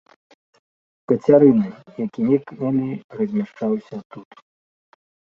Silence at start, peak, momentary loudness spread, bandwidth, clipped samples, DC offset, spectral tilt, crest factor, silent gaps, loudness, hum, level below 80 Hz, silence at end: 1.1 s; -2 dBFS; 16 LU; 6.6 kHz; under 0.1%; under 0.1%; -10 dB/octave; 20 dB; 3.04-3.09 s, 4.05-4.10 s; -20 LUFS; none; -64 dBFS; 1.2 s